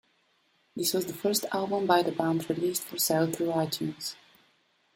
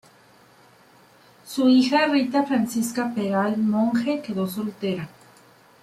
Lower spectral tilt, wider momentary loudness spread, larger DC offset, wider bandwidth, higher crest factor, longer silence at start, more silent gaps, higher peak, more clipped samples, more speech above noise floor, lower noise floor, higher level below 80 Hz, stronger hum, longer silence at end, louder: second, -4 dB/octave vs -5.5 dB/octave; about the same, 10 LU vs 11 LU; neither; about the same, 16.5 kHz vs 15.5 kHz; first, 22 dB vs 16 dB; second, 0.75 s vs 1.45 s; neither; about the same, -8 dBFS vs -6 dBFS; neither; first, 41 dB vs 32 dB; first, -69 dBFS vs -54 dBFS; about the same, -72 dBFS vs -68 dBFS; neither; about the same, 0.8 s vs 0.75 s; second, -28 LUFS vs -23 LUFS